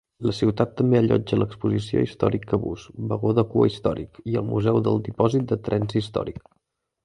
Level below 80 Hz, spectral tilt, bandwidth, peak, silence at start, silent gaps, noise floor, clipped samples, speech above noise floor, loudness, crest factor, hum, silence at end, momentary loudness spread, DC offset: -48 dBFS; -8.5 dB/octave; 10.5 kHz; -4 dBFS; 0.2 s; none; -75 dBFS; under 0.1%; 52 dB; -23 LUFS; 18 dB; none; 0.65 s; 9 LU; under 0.1%